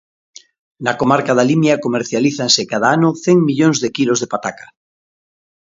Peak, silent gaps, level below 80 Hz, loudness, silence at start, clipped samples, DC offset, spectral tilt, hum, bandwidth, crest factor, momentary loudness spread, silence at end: 0 dBFS; none; -60 dBFS; -15 LUFS; 0.8 s; under 0.1%; under 0.1%; -4.5 dB/octave; none; 7.8 kHz; 16 dB; 8 LU; 1.1 s